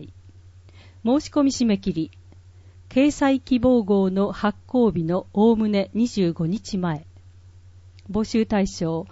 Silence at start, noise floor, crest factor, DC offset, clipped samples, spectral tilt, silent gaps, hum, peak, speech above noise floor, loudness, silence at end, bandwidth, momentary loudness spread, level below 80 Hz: 0 s; -47 dBFS; 14 dB; under 0.1%; under 0.1%; -6.5 dB/octave; none; none; -8 dBFS; 26 dB; -22 LUFS; 0.05 s; 8 kHz; 8 LU; -48 dBFS